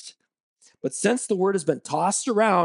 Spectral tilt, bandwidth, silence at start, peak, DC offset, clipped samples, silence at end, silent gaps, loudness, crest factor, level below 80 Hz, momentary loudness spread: -4 dB/octave; 11.5 kHz; 0.05 s; -8 dBFS; under 0.1%; under 0.1%; 0 s; 0.40-0.56 s; -24 LUFS; 16 dB; -78 dBFS; 11 LU